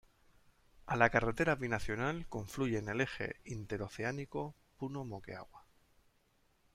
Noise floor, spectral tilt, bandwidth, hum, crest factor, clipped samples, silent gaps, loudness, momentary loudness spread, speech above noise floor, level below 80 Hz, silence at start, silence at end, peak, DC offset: -73 dBFS; -6 dB/octave; 16 kHz; none; 26 dB; under 0.1%; none; -37 LUFS; 16 LU; 37 dB; -56 dBFS; 0.85 s; 1.15 s; -12 dBFS; under 0.1%